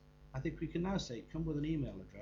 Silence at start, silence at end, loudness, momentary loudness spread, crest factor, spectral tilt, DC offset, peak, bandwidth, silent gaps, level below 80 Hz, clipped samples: 0 s; 0 s; -40 LUFS; 6 LU; 14 dB; -6.5 dB/octave; under 0.1%; -26 dBFS; 7.6 kHz; none; -52 dBFS; under 0.1%